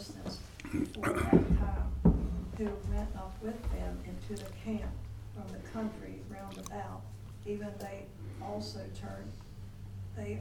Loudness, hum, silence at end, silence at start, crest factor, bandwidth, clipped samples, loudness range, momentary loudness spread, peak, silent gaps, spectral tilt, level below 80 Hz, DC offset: -37 LUFS; none; 0 s; 0 s; 26 dB; 17 kHz; under 0.1%; 10 LU; 17 LU; -10 dBFS; none; -7 dB/octave; -40 dBFS; under 0.1%